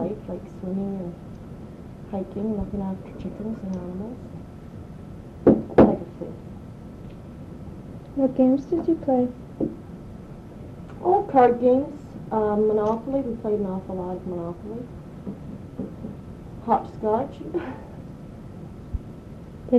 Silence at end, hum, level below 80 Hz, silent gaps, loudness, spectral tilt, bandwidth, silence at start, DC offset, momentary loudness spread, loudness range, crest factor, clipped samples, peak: 0 s; none; -46 dBFS; none; -25 LUFS; -9.5 dB/octave; 7.8 kHz; 0 s; under 0.1%; 21 LU; 9 LU; 22 dB; under 0.1%; -4 dBFS